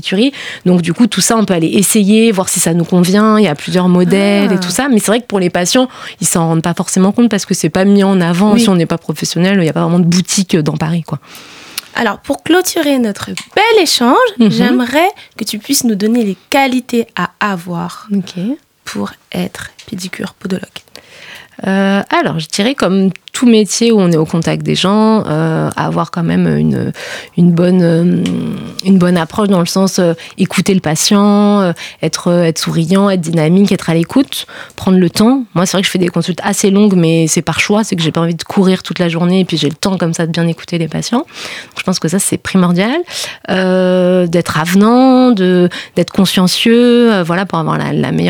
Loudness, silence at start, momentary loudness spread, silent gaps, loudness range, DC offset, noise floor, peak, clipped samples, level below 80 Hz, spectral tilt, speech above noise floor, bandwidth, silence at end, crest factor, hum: -12 LUFS; 0.05 s; 11 LU; none; 5 LU; under 0.1%; -34 dBFS; 0 dBFS; under 0.1%; -48 dBFS; -5 dB/octave; 23 dB; 18.5 kHz; 0 s; 12 dB; none